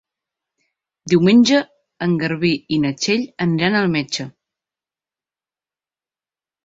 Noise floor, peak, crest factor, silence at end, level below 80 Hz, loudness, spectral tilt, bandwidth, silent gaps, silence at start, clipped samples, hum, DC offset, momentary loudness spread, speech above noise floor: under -90 dBFS; -2 dBFS; 18 dB; 2.35 s; -58 dBFS; -18 LUFS; -5.5 dB/octave; 7.8 kHz; none; 1.05 s; under 0.1%; none; under 0.1%; 13 LU; over 73 dB